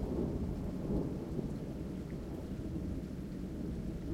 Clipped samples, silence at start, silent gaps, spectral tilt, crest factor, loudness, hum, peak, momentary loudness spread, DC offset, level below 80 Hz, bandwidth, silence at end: under 0.1%; 0 s; none; -8.5 dB/octave; 16 dB; -40 LUFS; none; -24 dBFS; 6 LU; under 0.1%; -46 dBFS; 16.5 kHz; 0 s